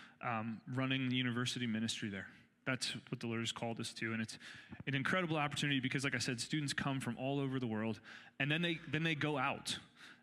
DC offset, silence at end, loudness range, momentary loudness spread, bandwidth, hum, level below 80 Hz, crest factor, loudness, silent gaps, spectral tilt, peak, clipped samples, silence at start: under 0.1%; 0.1 s; 3 LU; 9 LU; 14.5 kHz; none; -74 dBFS; 20 dB; -38 LUFS; none; -4.5 dB/octave; -20 dBFS; under 0.1%; 0 s